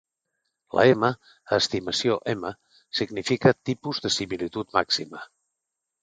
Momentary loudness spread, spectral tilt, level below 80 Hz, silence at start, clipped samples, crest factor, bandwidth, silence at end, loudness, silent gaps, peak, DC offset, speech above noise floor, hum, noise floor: 11 LU; -4.5 dB/octave; -60 dBFS; 0.75 s; under 0.1%; 22 dB; 9.4 kHz; 0.8 s; -24 LUFS; none; -4 dBFS; under 0.1%; 59 dB; none; -84 dBFS